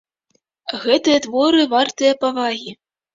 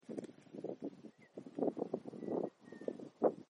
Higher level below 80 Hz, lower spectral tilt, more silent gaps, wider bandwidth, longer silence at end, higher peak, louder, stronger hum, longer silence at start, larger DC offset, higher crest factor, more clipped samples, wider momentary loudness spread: first, -64 dBFS vs under -90 dBFS; second, -2.5 dB/octave vs -8.5 dB/octave; neither; second, 7.8 kHz vs 10 kHz; first, 0.4 s vs 0.05 s; first, -2 dBFS vs -18 dBFS; first, -17 LUFS vs -43 LUFS; neither; first, 0.65 s vs 0.1 s; neither; second, 16 dB vs 24 dB; neither; about the same, 13 LU vs 15 LU